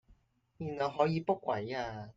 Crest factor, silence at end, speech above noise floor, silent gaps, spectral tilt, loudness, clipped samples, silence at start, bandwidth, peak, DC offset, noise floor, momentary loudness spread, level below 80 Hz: 20 dB; 0.05 s; 33 dB; none; -7 dB/octave; -34 LUFS; under 0.1%; 0.1 s; 7.6 kHz; -14 dBFS; under 0.1%; -67 dBFS; 10 LU; -66 dBFS